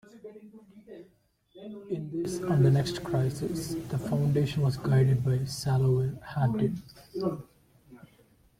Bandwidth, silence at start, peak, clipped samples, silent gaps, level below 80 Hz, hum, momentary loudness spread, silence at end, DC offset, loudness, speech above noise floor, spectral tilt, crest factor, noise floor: 15 kHz; 0.15 s; -14 dBFS; under 0.1%; none; -56 dBFS; none; 22 LU; 0.65 s; under 0.1%; -28 LUFS; 34 dB; -7.5 dB/octave; 16 dB; -62 dBFS